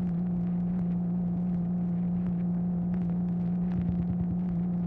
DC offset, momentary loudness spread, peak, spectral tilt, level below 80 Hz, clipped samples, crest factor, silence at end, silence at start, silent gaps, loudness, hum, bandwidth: under 0.1%; 1 LU; -18 dBFS; -12.5 dB/octave; -48 dBFS; under 0.1%; 12 dB; 0 s; 0 s; none; -30 LUFS; none; 2.5 kHz